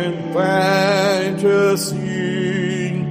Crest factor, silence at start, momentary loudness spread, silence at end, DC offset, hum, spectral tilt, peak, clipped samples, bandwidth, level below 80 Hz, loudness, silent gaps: 12 dB; 0 s; 6 LU; 0 s; under 0.1%; none; -5.5 dB/octave; -4 dBFS; under 0.1%; 15.5 kHz; -58 dBFS; -18 LUFS; none